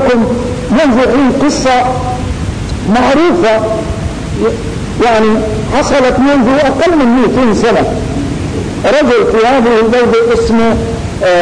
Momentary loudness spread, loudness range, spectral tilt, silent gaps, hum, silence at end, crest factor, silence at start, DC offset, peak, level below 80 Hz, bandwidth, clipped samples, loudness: 8 LU; 2 LU; -6 dB/octave; none; none; 0 s; 6 dB; 0 s; under 0.1%; -4 dBFS; -26 dBFS; 10.5 kHz; under 0.1%; -10 LUFS